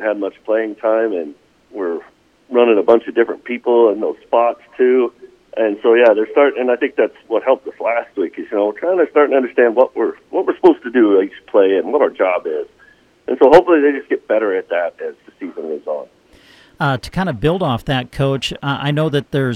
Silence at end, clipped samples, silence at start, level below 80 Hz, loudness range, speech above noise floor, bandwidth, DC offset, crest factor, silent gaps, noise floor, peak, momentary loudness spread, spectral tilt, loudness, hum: 0 s; under 0.1%; 0 s; -48 dBFS; 6 LU; 35 dB; 11 kHz; under 0.1%; 16 dB; none; -50 dBFS; 0 dBFS; 12 LU; -7 dB/octave; -16 LUFS; none